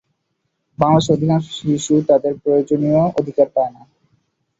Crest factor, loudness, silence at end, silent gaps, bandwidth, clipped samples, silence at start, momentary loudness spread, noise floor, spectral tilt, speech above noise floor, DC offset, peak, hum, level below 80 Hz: 16 dB; -17 LUFS; 0.9 s; none; 8 kHz; under 0.1%; 0.8 s; 6 LU; -72 dBFS; -7 dB/octave; 56 dB; under 0.1%; -2 dBFS; none; -54 dBFS